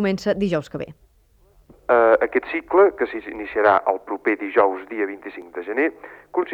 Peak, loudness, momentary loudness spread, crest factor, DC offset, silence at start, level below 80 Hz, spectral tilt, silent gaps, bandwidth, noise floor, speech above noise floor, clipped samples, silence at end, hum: -4 dBFS; -21 LUFS; 16 LU; 18 dB; under 0.1%; 0 s; -56 dBFS; -7 dB/octave; none; 8.2 kHz; -57 dBFS; 36 dB; under 0.1%; 0 s; none